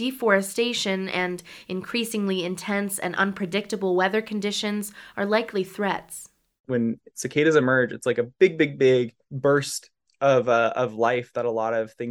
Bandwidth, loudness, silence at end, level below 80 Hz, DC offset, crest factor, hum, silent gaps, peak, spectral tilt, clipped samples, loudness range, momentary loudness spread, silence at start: 18.5 kHz; -24 LUFS; 0 s; -68 dBFS; under 0.1%; 18 dB; none; 6.60-6.64 s; -6 dBFS; -4.5 dB/octave; under 0.1%; 4 LU; 11 LU; 0 s